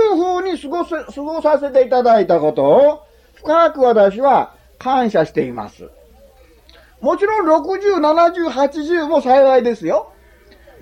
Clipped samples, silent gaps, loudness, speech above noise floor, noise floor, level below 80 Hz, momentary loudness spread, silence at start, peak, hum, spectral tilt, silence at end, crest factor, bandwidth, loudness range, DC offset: under 0.1%; none; -15 LUFS; 32 dB; -47 dBFS; -50 dBFS; 12 LU; 0 s; -2 dBFS; none; -6 dB/octave; 0.75 s; 12 dB; 9.8 kHz; 5 LU; under 0.1%